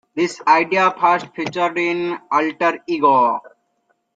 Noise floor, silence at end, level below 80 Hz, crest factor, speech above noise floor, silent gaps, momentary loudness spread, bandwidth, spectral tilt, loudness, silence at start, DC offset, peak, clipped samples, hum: -67 dBFS; 0.65 s; -68 dBFS; 16 dB; 49 dB; none; 8 LU; 9 kHz; -5 dB/octave; -18 LUFS; 0.15 s; under 0.1%; -2 dBFS; under 0.1%; none